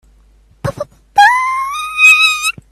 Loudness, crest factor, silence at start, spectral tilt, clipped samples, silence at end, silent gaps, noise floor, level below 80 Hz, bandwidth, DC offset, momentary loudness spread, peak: -9 LUFS; 14 dB; 0.65 s; -1 dB/octave; under 0.1%; 0.2 s; none; -48 dBFS; -46 dBFS; 16 kHz; under 0.1%; 19 LU; 0 dBFS